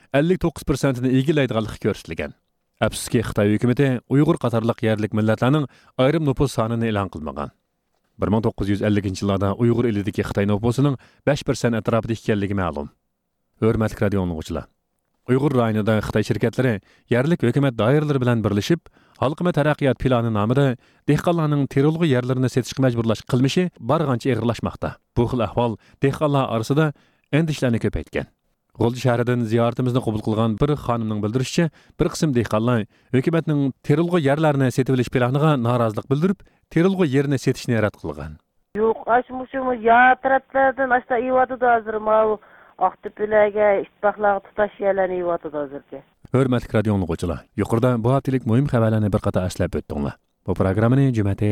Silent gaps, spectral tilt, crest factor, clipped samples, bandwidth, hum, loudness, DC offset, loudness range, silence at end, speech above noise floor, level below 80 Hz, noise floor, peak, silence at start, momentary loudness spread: none; -7 dB/octave; 16 dB; under 0.1%; 14.5 kHz; none; -21 LUFS; under 0.1%; 3 LU; 0 s; 53 dB; -44 dBFS; -73 dBFS; -4 dBFS; 0.15 s; 8 LU